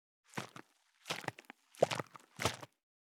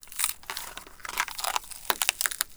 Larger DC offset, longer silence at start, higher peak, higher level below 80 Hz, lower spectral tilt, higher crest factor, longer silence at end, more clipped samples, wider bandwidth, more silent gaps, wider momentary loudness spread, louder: neither; first, 0.35 s vs 0 s; second, -12 dBFS vs 0 dBFS; second, -76 dBFS vs -56 dBFS; first, -3.5 dB/octave vs 1.5 dB/octave; about the same, 30 dB vs 32 dB; first, 0.45 s vs 0 s; neither; about the same, 19.5 kHz vs over 20 kHz; neither; first, 22 LU vs 11 LU; second, -40 LUFS vs -29 LUFS